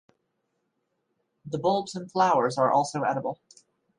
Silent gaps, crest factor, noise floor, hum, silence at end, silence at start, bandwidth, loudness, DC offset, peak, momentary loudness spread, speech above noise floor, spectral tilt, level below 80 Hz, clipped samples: none; 18 dB; -77 dBFS; none; 0.65 s; 1.45 s; 11 kHz; -26 LUFS; under 0.1%; -10 dBFS; 13 LU; 52 dB; -5.5 dB/octave; -74 dBFS; under 0.1%